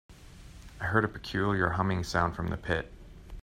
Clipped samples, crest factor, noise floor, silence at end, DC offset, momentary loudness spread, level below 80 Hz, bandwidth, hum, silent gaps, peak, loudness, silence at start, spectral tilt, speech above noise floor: under 0.1%; 22 dB; -49 dBFS; 0 s; under 0.1%; 22 LU; -48 dBFS; 15.5 kHz; none; none; -8 dBFS; -30 LUFS; 0.1 s; -6 dB/octave; 20 dB